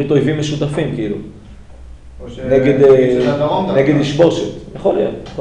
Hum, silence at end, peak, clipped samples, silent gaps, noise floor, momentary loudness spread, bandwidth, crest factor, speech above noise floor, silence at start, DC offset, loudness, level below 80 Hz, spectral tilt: none; 0 s; 0 dBFS; under 0.1%; none; -35 dBFS; 16 LU; 10 kHz; 14 dB; 21 dB; 0 s; under 0.1%; -14 LUFS; -38 dBFS; -7 dB/octave